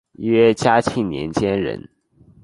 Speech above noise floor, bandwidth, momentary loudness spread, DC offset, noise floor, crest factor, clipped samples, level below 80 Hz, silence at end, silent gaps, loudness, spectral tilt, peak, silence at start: 34 dB; 11.5 kHz; 10 LU; under 0.1%; -52 dBFS; 18 dB; under 0.1%; -48 dBFS; 0.65 s; none; -18 LUFS; -6 dB/octave; -2 dBFS; 0.2 s